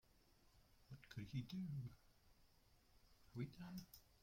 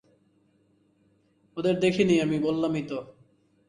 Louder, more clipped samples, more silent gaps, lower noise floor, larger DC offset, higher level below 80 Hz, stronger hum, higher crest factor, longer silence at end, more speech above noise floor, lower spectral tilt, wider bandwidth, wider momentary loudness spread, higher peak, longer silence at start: second, -53 LUFS vs -26 LUFS; neither; neither; first, -74 dBFS vs -66 dBFS; neither; second, -74 dBFS vs -64 dBFS; neither; about the same, 20 dB vs 20 dB; second, 0.05 s vs 0.6 s; second, 23 dB vs 41 dB; about the same, -6.5 dB/octave vs -6.5 dB/octave; first, 16.5 kHz vs 10.5 kHz; about the same, 14 LU vs 14 LU; second, -36 dBFS vs -8 dBFS; second, 0.15 s vs 1.55 s